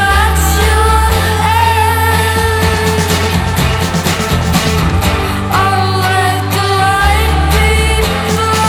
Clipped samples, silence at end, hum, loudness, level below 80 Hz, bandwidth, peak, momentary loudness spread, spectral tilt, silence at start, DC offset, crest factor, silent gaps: under 0.1%; 0 s; none; -11 LUFS; -18 dBFS; 19 kHz; 0 dBFS; 3 LU; -4.5 dB/octave; 0 s; under 0.1%; 10 dB; none